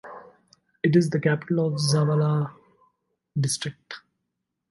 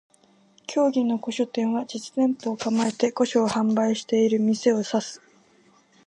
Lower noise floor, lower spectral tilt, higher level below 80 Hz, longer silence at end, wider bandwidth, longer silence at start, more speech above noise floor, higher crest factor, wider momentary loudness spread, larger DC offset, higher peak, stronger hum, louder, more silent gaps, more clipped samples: first, -81 dBFS vs -59 dBFS; about the same, -6 dB/octave vs -5 dB/octave; first, -66 dBFS vs -72 dBFS; second, 0.7 s vs 0.9 s; first, 11.5 kHz vs 10 kHz; second, 0.05 s vs 0.7 s; first, 58 dB vs 36 dB; about the same, 18 dB vs 18 dB; first, 20 LU vs 8 LU; neither; about the same, -8 dBFS vs -8 dBFS; neither; about the same, -24 LUFS vs -24 LUFS; neither; neither